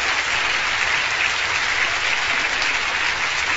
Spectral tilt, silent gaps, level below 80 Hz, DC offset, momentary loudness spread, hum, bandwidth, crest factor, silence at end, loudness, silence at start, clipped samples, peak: 0 dB/octave; none; -48 dBFS; under 0.1%; 1 LU; none; 8.2 kHz; 16 dB; 0 s; -19 LUFS; 0 s; under 0.1%; -4 dBFS